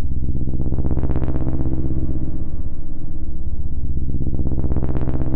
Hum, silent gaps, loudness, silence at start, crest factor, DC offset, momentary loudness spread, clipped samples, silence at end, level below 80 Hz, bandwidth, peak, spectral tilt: none; none; -25 LUFS; 0 s; 6 dB; under 0.1%; 8 LU; under 0.1%; 0 s; -22 dBFS; 1.7 kHz; -6 dBFS; -12 dB/octave